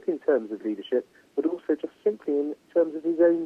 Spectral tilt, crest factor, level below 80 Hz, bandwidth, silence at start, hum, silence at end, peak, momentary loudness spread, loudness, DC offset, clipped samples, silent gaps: -7.5 dB/octave; 16 dB; -78 dBFS; 5.2 kHz; 0.05 s; none; 0 s; -10 dBFS; 6 LU; -27 LUFS; under 0.1%; under 0.1%; none